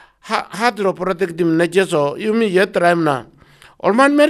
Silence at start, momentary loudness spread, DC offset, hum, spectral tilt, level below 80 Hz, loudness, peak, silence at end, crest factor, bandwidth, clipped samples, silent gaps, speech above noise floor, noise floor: 0.25 s; 8 LU; under 0.1%; none; -5.5 dB/octave; -58 dBFS; -17 LUFS; 0 dBFS; 0 s; 16 dB; 13.5 kHz; under 0.1%; none; 31 dB; -46 dBFS